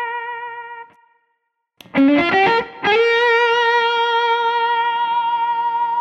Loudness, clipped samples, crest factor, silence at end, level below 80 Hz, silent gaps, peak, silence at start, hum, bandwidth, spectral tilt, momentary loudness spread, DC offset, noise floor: -16 LUFS; under 0.1%; 14 dB; 0 s; -60 dBFS; none; -4 dBFS; 0 s; none; 8 kHz; -4.5 dB/octave; 14 LU; under 0.1%; -71 dBFS